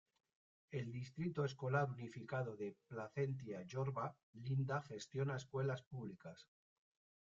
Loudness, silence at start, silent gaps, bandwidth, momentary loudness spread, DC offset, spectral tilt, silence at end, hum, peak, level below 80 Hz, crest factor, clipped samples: -45 LUFS; 0.7 s; 4.23-4.33 s, 5.86-5.91 s; 7.4 kHz; 11 LU; under 0.1%; -6.5 dB/octave; 0.9 s; none; -24 dBFS; -78 dBFS; 20 dB; under 0.1%